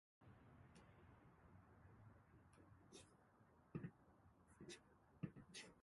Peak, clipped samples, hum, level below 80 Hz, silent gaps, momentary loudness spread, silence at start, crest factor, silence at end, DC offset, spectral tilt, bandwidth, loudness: -36 dBFS; under 0.1%; none; -78 dBFS; none; 13 LU; 0.2 s; 28 dB; 0 s; under 0.1%; -5 dB/octave; 11.5 kHz; -62 LUFS